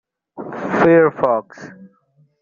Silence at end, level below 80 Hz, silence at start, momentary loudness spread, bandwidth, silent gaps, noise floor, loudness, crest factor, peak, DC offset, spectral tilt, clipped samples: 0.55 s; -58 dBFS; 0.35 s; 25 LU; 7.2 kHz; none; -58 dBFS; -16 LUFS; 16 dB; -2 dBFS; under 0.1%; -6.5 dB/octave; under 0.1%